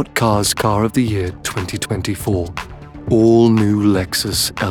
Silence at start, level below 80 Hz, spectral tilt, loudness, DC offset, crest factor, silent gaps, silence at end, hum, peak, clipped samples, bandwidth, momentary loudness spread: 0 s; -38 dBFS; -5 dB/octave; -16 LUFS; under 0.1%; 14 dB; none; 0 s; none; -2 dBFS; under 0.1%; 19 kHz; 11 LU